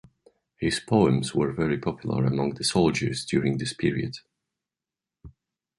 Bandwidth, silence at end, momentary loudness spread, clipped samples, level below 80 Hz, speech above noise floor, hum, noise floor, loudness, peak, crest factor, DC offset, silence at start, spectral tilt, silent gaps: 11.5 kHz; 0.5 s; 7 LU; under 0.1%; -52 dBFS; 65 dB; none; -90 dBFS; -25 LUFS; -6 dBFS; 20 dB; under 0.1%; 0.6 s; -5.5 dB/octave; none